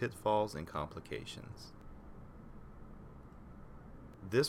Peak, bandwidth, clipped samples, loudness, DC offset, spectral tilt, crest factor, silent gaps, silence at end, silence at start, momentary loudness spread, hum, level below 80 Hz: -18 dBFS; 16.5 kHz; under 0.1%; -39 LUFS; under 0.1%; -5 dB/octave; 22 dB; none; 0 s; 0 s; 21 LU; none; -56 dBFS